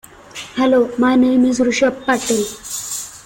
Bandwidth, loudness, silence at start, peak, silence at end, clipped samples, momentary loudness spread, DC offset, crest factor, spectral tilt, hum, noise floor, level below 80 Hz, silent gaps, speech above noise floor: 17 kHz; -16 LUFS; 0.35 s; -4 dBFS; 0.05 s; under 0.1%; 12 LU; under 0.1%; 12 dB; -3.5 dB/octave; none; -35 dBFS; -52 dBFS; none; 20 dB